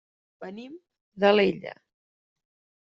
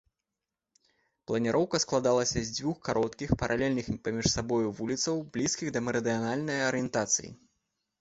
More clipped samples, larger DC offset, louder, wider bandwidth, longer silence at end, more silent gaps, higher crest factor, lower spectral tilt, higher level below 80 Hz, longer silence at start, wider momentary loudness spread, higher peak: neither; neither; first, -23 LUFS vs -30 LUFS; second, 7 kHz vs 8.2 kHz; first, 1.15 s vs 0.65 s; first, 1.01-1.12 s vs none; about the same, 22 dB vs 20 dB; about the same, -3.5 dB/octave vs -4 dB/octave; second, -68 dBFS vs -52 dBFS; second, 0.4 s vs 1.3 s; first, 23 LU vs 5 LU; first, -6 dBFS vs -10 dBFS